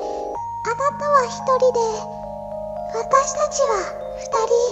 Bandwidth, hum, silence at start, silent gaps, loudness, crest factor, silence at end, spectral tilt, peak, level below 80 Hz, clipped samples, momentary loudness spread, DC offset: 8.4 kHz; none; 0 s; none; -21 LUFS; 18 dB; 0 s; -3 dB/octave; -2 dBFS; -50 dBFS; under 0.1%; 13 LU; under 0.1%